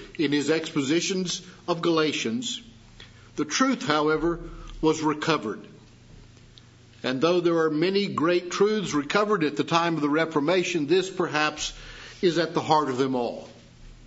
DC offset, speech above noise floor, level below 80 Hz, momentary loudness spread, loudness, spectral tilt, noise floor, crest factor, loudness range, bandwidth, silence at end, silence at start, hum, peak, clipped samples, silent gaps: under 0.1%; 27 dB; -52 dBFS; 10 LU; -25 LUFS; -4.5 dB/octave; -51 dBFS; 22 dB; 3 LU; 8 kHz; 0 s; 0 s; none; -4 dBFS; under 0.1%; none